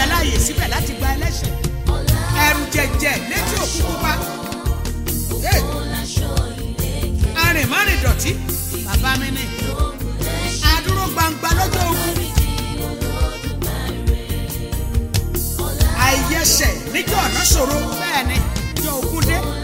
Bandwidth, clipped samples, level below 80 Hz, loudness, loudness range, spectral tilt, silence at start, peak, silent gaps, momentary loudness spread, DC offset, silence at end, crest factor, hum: 16.5 kHz; under 0.1%; -24 dBFS; -19 LUFS; 5 LU; -3.5 dB/octave; 0 s; 0 dBFS; none; 8 LU; under 0.1%; 0 s; 18 dB; none